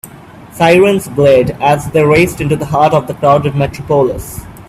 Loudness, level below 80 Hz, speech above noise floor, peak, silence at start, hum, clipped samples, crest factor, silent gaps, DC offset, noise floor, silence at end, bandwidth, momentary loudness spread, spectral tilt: -11 LUFS; -36 dBFS; 24 dB; 0 dBFS; 0.05 s; none; under 0.1%; 12 dB; none; under 0.1%; -34 dBFS; 0.05 s; 15.5 kHz; 7 LU; -6 dB/octave